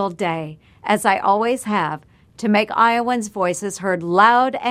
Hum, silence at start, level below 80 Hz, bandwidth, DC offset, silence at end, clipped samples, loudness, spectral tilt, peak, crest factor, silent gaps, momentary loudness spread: none; 0 s; -60 dBFS; 15.5 kHz; under 0.1%; 0 s; under 0.1%; -18 LUFS; -4.5 dB/octave; 0 dBFS; 18 dB; none; 12 LU